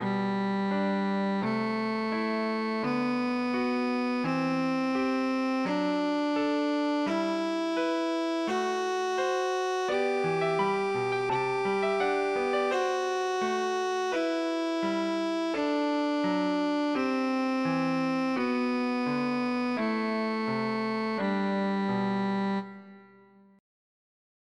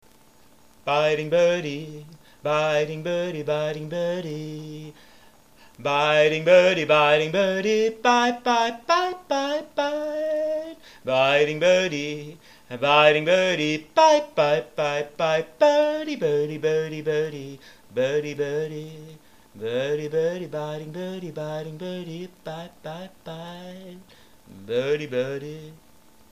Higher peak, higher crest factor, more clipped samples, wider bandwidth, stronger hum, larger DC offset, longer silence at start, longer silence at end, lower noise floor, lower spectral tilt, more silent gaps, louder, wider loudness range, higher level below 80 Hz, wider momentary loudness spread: second, -16 dBFS vs -2 dBFS; second, 12 dB vs 22 dB; neither; second, 11.5 kHz vs 15 kHz; neither; second, under 0.1% vs 0.2%; second, 0 s vs 0.85 s; first, 1.55 s vs 0.55 s; about the same, -57 dBFS vs -56 dBFS; first, -6 dB/octave vs -4.5 dB/octave; neither; second, -29 LUFS vs -23 LUFS; second, 1 LU vs 11 LU; second, -72 dBFS vs -66 dBFS; second, 2 LU vs 19 LU